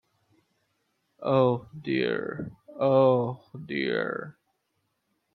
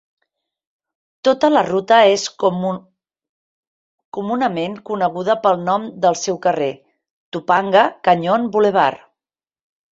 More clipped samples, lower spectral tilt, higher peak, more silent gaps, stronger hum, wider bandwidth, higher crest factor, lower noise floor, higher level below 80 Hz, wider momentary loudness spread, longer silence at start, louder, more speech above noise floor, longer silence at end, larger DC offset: neither; first, -9.5 dB/octave vs -4.5 dB/octave; second, -8 dBFS vs 0 dBFS; second, none vs 3.29-3.98 s, 4.05-4.12 s, 7.11-7.32 s; neither; second, 4.5 kHz vs 8 kHz; about the same, 20 dB vs 18 dB; second, -77 dBFS vs under -90 dBFS; about the same, -68 dBFS vs -64 dBFS; first, 17 LU vs 11 LU; about the same, 1.2 s vs 1.25 s; second, -27 LUFS vs -17 LUFS; second, 51 dB vs over 74 dB; about the same, 1.05 s vs 0.95 s; neither